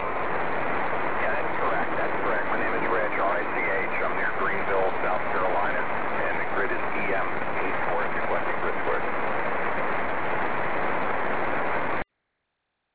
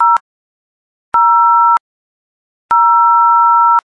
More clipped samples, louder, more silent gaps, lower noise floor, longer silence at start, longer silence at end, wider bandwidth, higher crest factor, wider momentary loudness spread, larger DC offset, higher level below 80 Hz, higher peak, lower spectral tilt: neither; second, -27 LUFS vs -10 LUFS; second, none vs 0.21-1.12 s, 1.80-2.69 s; second, -79 dBFS vs under -90 dBFS; about the same, 0 s vs 0 s; about the same, 0 s vs 0.1 s; second, 4 kHz vs 5.6 kHz; about the same, 14 dB vs 10 dB; second, 3 LU vs 7 LU; first, 5% vs under 0.1%; first, -52 dBFS vs -62 dBFS; second, -12 dBFS vs -2 dBFS; first, -8.5 dB/octave vs -2.5 dB/octave